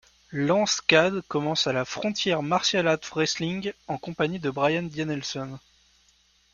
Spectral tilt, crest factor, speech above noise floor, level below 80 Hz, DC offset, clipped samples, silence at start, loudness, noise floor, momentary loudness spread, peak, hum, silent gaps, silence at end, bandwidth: -4 dB/octave; 24 dB; 37 dB; -62 dBFS; under 0.1%; under 0.1%; 0.3 s; -25 LUFS; -63 dBFS; 12 LU; -2 dBFS; none; none; 0.95 s; 7.4 kHz